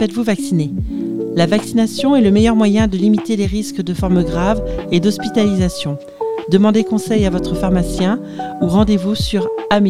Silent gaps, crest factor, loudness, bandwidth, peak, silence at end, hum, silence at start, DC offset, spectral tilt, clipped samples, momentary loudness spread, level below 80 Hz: none; 14 dB; -16 LUFS; 14 kHz; 0 dBFS; 0 s; none; 0 s; 0.7%; -6.5 dB/octave; under 0.1%; 9 LU; -30 dBFS